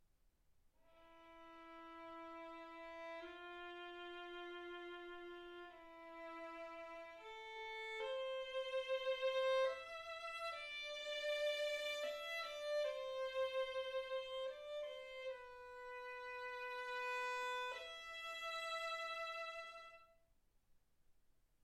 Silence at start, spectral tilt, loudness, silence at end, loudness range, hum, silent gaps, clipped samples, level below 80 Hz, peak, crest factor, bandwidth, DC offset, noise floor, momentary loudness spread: 0.55 s; -1 dB/octave; -46 LUFS; 0.3 s; 10 LU; none; none; under 0.1%; -78 dBFS; -30 dBFS; 16 dB; 14 kHz; under 0.1%; -76 dBFS; 14 LU